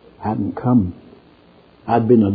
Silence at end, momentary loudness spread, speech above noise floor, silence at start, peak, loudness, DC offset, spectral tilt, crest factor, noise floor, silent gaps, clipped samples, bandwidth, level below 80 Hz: 0 s; 12 LU; 33 dB; 0.2 s; -2 dBFS; -19 LUFS; under 0.1%; -12.5 dB/octave; 18 dB; -49 dBFS; none; under 0.1%; 4.9 kHz; -52 dBFS